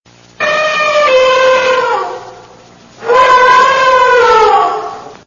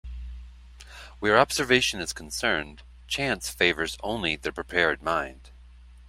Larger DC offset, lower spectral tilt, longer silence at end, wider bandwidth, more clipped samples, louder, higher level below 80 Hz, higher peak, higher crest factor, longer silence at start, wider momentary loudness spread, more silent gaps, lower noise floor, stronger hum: first, 0.1% vs under 0.1%; about the same, -2 dB/octave vs -3 dB/octave; about the same, 0.1 s vs 0 s; second, 7.4 kHz vs 16 kHz; first, 0.1% vs under 0.1%; first, -8 LUFS vs -25 LUFS; about the same, -46 dBFS vs -46 dBFS; first, 0 dBFS vs -4 dBFS; second, 10 dB vs 24 dB; first, 0.4 s vs 0.05 s; second, 14 LU vs 21 LU; neither; second, -38 dBFS vs -49 dBFS; second, none vs 60 Hz at -45 dBFS